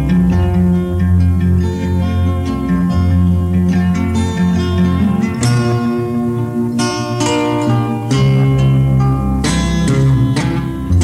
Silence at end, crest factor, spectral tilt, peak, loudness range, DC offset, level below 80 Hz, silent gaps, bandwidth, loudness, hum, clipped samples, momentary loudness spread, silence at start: 0 s; 10 dB; -7 dB/octave; -4 dBFS; 2 LU; under 0.1%; -28 dBFS; none; 13 kHz; -14 LUFS; none; under 0.1%; 5 LU; 0 s